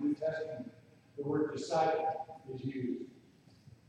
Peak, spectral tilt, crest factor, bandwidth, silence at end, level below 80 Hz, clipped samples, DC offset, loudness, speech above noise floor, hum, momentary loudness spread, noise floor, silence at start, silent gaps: -20 dBFS; -6.5 dB/octave; 18 dB; 9.8 kHz; 0.2 s; -74 dBFS; under 0.1%; under 0.1%; -36 LUFS; 28 dB; none; 15 LU; -62 dBFS; 0 s; none